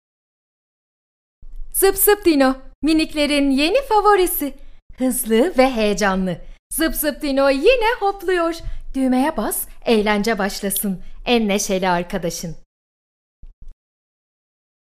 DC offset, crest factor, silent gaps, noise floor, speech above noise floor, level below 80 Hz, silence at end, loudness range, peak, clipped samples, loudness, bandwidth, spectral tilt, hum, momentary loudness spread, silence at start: under 0.1%; 18 dB; 2.75-2.82 s, 4.82-4.90 s, 6.59-6.70 s, 12.66-13.43 s, 13.53-13.62 s; under -90 dBFS; over 72 dB; -36 dBFS; 1.2 s; 6 LU; 0 dBFS; under 0.1%; -18 LUFS; 15.5 kHz; -3.5 dB/octave; none; 10 LU; 1.4 s